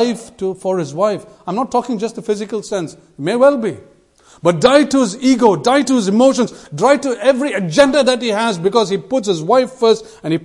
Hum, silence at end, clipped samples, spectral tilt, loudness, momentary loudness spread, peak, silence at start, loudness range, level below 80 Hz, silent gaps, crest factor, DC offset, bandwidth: none; 0 s; under 0.1%; -5 dB/octave; -15 LUFS; 10 LU; 0 dBFS; 0 s; 5 LU; -54 dBFS; none; 16 dB; under 0.1%; 11.5 kHz